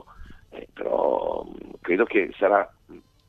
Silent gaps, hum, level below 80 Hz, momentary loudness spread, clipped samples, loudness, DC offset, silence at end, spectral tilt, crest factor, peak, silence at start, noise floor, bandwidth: none; none; -54 dBFS; 20 LU; under 0.1%; -24 LUFS; under 0.1%; 0.3 s; -7.5 dB/octave; 20 dB; -6 dBFS; 0.2 s; -50 dBFS; 6 kHz